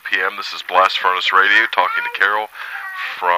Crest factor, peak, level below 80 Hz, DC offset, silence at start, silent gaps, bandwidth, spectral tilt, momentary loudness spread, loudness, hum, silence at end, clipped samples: 18 dB; 0 dBFS; -70 dBFS; under 0.1%; 0.05 s; none; 15.5 kHz; -0.5 dB/octave; 14 LU; -16 LUFS; none; 0 s; under 0.1%